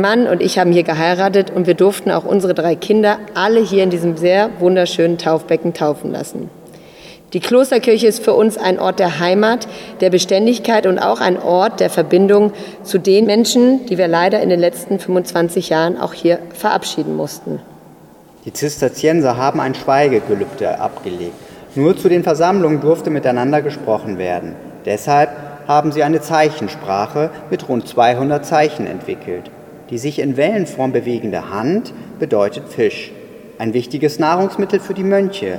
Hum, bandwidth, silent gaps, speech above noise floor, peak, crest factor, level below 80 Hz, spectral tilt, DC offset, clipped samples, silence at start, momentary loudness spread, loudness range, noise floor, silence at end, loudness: none; 17 kHz; none; 28 dB; 0 dBFS; 14 dB; -56 dBFS; -5.5 dB/octave; under 0.1%; under 0.1%; 0 s; 11 LU; 5 LU; -43 dBFS; 0 s; -15 LUFS